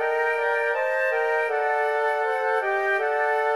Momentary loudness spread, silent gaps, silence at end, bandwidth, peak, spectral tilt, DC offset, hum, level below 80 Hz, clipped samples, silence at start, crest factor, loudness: 1 LU; none; 0 s; 13 kHz; -12 dBFS; -1 dB/octave; 0.1%; none; -78 dBFS; under 0.1%; 0 s; 10 dB; -23 LUFS